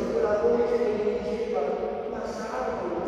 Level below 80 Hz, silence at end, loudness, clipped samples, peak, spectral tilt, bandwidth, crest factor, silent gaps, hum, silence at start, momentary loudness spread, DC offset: -52 dBFS; 0 s; -27 LUFS; under 0.1%; -12 dBFS; -6 dB/octave; 9.6 kHz; 14 dB; none; none; 0 s; 9 LU; under 0.1%